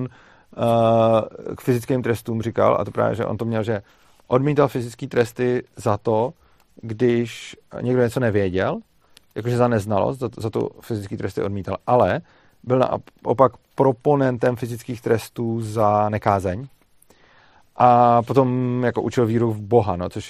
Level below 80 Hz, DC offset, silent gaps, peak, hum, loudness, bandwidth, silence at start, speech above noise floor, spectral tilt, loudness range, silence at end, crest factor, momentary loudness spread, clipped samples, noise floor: -56 dBFS; under 0.1%; none; 0 dBFS; none; -21 LUFS; 14.5 kHz; 0 s; 34 dB; -7.5 dB/octave; 4 LU; 0 s; 20 dB; 12 LU; under 0.1%; -54 dBFS